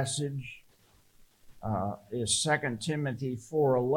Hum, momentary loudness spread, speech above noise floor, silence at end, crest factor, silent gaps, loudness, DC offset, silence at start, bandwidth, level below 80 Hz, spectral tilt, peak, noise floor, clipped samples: none; 14 LU; 33 dB; 0 s; 18 dB; none; -31 LUFS; under 0.1%; 0 s; 17 kHz; -62 dBFS; -4 dB/octave; -12 dBFS; -63 dBFS; under 0.1%